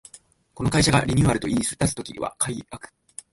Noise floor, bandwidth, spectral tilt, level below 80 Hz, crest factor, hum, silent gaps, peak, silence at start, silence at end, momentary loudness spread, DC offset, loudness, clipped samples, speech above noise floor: -52 dBFS; 12 kHz; -4.5 dB/octave; -42 dBFS; 18 dB; none; none; -6 dBFS; 0.55 s; 0.45 s; 22 LU; under 0.1%; -23 LUFS; under 0.1%; 29 dB